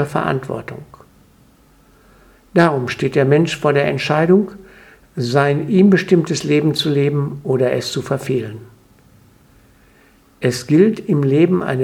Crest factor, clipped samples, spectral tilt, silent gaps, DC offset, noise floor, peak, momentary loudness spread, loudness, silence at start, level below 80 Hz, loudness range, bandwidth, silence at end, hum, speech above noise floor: 18 dB; under 0.1%; -6.5 dB/octave; none; under 0.1%; -51 dBFS; 0 dBFS; 11 LU; -16 LUFS; 0 s; -54 dBFS; 6 LU; 15.5 kHz; 0 s; none; 35 dB